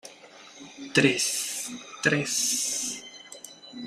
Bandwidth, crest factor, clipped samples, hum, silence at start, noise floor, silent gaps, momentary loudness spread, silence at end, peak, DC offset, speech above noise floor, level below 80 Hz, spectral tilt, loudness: 15.5 kHz; 24 dB; under 0.1%; none; 0.05 s; -49 dBFS; none; 22 LU; 0 s; -6 dBFS; under 0.1%; 24 dB; -70 dBFS; -2.5 dB/octave; -25 LUFS